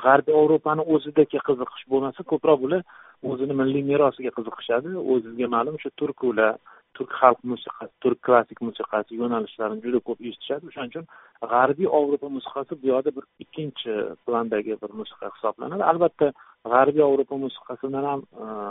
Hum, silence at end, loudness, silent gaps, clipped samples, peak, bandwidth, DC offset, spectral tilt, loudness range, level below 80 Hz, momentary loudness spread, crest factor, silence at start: none; 0 s; -24 LUFS; none; under 0.1%; 0 dBFS; 4 kHz; under 0.1%; -4.5 dB/octave; 4 LU; -68 dBFS; 14 LU; 24 dB; 0 s